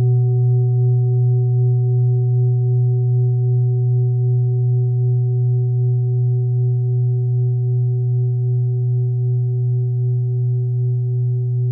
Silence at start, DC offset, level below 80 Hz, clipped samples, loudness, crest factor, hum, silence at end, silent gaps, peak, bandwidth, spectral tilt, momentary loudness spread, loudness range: 0 s; under 0.1%; -62 dBFS; under 0.1%; -18 LUFS; 6 dB; none; 0 s; none; -10 dBFS; 0.8 kHz; -20.5 dB/octave; 3 LU; 2 LU